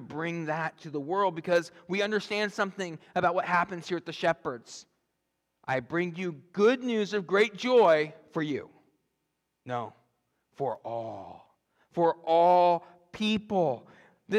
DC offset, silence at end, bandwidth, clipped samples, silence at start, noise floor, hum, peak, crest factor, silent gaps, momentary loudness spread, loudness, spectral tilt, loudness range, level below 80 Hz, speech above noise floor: under 0.1%; 0 s; 11.5 kHz; under 0.1%; 0 s; -81 dBFS; none; -12 dBFS; 18 dB; none; 15 LU; -28 LUFS; -5.5 dB/octave; 8 LU; -74 dBFS; 52 dB